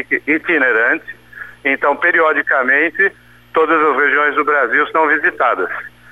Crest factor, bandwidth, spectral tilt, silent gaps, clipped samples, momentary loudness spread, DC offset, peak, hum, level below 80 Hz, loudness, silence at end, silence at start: 12 dB; 12 kHz; -5.5 dB/octave; none; under 0.1%; 9 LU; 0.2%; -4 dBFS; 60 Hz at -55 dBFS; -58 dBFS; -14 LUFS; 0.25 s; 0 s